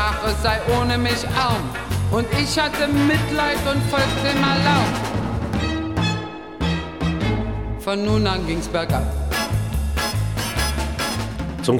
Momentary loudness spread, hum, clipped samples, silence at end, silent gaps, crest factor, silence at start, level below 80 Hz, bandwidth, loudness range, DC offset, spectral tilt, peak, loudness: 6 LU; none; under 0.1%; 0 s; none; 18 dB; 0 s; -30 dBFS; 18 kHz; 4 LU; 0.4%; -5 dB/octave; -4 dBFS; -21 LUFS